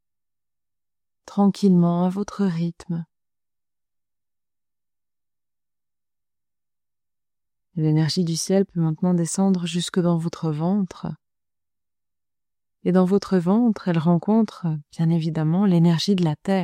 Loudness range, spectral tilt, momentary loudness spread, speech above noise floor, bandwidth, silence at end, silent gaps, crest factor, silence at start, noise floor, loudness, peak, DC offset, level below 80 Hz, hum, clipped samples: 9 LU; -7 dB/octave; 10 LU; over 70 dB; 11.5 kHz; 0 s; none; 18 dB; 1.25 s; under -90 dBFS; -22 LUFS; -4 dBFS; under 0.1%; -62 dBFS; none; under 0.1%